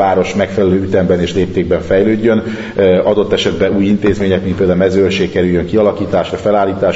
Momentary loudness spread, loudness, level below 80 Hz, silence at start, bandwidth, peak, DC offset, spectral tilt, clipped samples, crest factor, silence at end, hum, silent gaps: 4 LU; -13 LUFS; -38 dBFS; 0 s; 8 kHz; 0 dBFS; under 0.1%; -7 dB/octave; under 0.1%; 12 dB; 0 s; none; none